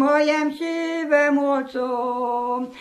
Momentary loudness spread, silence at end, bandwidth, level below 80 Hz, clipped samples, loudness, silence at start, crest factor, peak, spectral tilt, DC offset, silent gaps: 7 LU; 0 s; 12 kHz; -70 dBFS; under 0.1%; -22 LUFS; 0 s; 14 dB; -6 dBFS; -3.5 dB/octave; under 0.1%; none